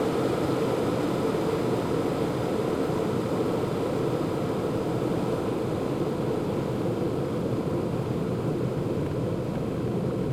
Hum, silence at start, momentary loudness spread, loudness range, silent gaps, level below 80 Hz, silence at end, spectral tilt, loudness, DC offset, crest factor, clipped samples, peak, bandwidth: none; 0 s; 2 LU; 2 LU; none; -50 dBFS; 0 s; -7.5 dB/octave; -28 LUFS; under 0.1%; 14 dB; under 0.1%; -14 dBFS; 16 kHz